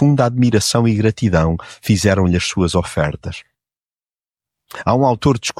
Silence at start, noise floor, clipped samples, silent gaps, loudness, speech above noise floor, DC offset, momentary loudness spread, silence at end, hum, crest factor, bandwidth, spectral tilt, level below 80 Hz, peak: 0 s; under -90 dBFS; under 0.1%; none; -16 LUFS; over 74 dB; under 0.1%; 10 LU; 0.1 s; none; 16 dB; 15 kHz; -5.5 dB/octave; -36 dBFS; -2 dBFS